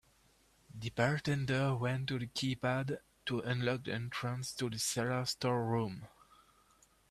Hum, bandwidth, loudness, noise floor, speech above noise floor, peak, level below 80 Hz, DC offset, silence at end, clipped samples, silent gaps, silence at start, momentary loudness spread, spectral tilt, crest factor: none; 14 kHz; -36 LUFS; -69 dBFS; 34 dB; -16 dBFS; -66 dBFS; under 0.1%; 1.05 s; under 0.1%; none; 0.75 s; 9 LU; -5 dB/octave; 22 dB